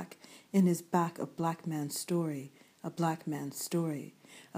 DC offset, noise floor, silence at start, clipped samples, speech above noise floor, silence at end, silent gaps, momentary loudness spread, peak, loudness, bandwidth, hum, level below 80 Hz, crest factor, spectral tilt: under 0.1%; -54 dBFS; 0 s; under 0.1%; 21 dB; 0 s; none; 18 LU; -14 dBFS; -34 LUFS; 15.5 kHz; none; -84 dBFS; 20 dB; -6 dB/octave